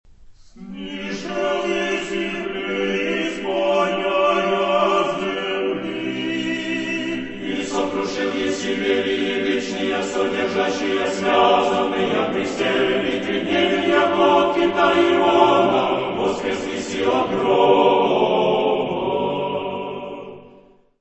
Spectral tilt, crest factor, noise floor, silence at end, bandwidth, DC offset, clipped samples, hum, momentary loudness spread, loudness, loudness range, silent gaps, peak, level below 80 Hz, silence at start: -4.5 dB/octave; 20 dB; -50 dBFS; 0.5 s; 8.4 kHz; under 0.1%; under 0.1%; none; 10 LU; -20 LUFS; 6 LU; none; 0 dBFS; -54 dBFS; 0.2 s